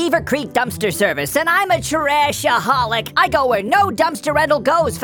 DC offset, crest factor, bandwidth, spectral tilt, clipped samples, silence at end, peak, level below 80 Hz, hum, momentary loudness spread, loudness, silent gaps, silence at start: under 0.1%; 14 dB; over 20 kHz; -3.5 dB/octave; under 0.1%; 0 s; -2 dBFS; -44 dBFS; none; 3 LU; -16 LUFS; none; 0 s